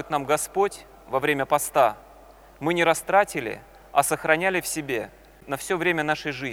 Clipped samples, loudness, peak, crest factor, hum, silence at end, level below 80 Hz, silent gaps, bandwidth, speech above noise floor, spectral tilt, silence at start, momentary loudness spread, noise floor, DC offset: under 0.1%; -24 LUFS; -2 dBFS; 22 dB; none; 0 s; -56 dBFS; none; 19 kHz; 25 dB; -3.5 dB/octave; 0 s; 12 LU; -49 dBFS; under 0.1%